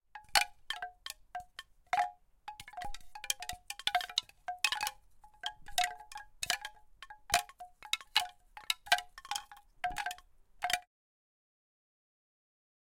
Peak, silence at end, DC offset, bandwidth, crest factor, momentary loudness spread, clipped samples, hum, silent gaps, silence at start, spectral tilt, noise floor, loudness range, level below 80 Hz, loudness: -10 dBFS; 2.05 s; under 0.1%; 17 kHz; 30 dB; 19 LU; under 0.1%; none; none; 0.15 s; 1 dB/octave; -59 dBFS; 5 LU; -62 dBFS; -36 LUFS